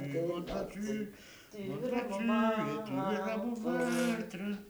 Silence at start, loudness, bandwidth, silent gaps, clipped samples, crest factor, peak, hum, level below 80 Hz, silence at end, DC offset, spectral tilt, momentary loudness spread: 0 s; -35 LUFS; over 20 kHz; none; under 0.1%; 14 dB; -20 dBFS; none; -62 dBFS; 0 s; under 0.1%; -6 dB/octave; 11 LU